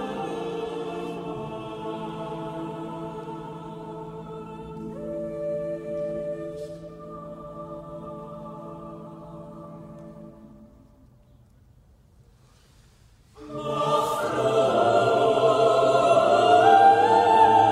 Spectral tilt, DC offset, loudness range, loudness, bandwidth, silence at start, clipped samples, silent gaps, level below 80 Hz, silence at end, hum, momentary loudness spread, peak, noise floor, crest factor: -5.5 dB/octave; under 0.1%; 23 LU; -22 LUFS; 14.5 kHz; 0 s; under 0.1%; none; -58 dBFS; 0 s; none; 23 LU; -6 dBFS; -56 dBFS; 20 dB